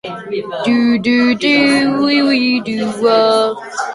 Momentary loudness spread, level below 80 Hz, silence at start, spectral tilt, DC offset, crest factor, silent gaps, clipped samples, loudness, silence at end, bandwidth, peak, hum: 10 LU; -56 dBFS; 0.05 s; -4.5 dB/octave; under 0.1%; 12 dB; none; under 0.1%; -13 LUFS; 0 s; 11.5 kHz; -2 dBFS; none